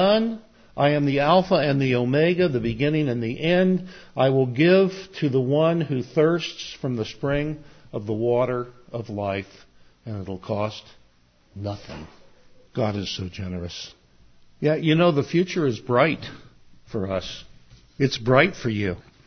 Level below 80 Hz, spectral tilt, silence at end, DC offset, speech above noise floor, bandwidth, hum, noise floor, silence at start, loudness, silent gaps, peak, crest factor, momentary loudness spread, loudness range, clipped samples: -50 dBFS; -7 dB/octave; 0.25 s; under 0.1%; 36 dB; 6.6 kHz; none; -59 dBFS; 0 s; -23 LUFS; none; -2 dBFS; 22 dB; 16 LU; 11 LU; under 0.1%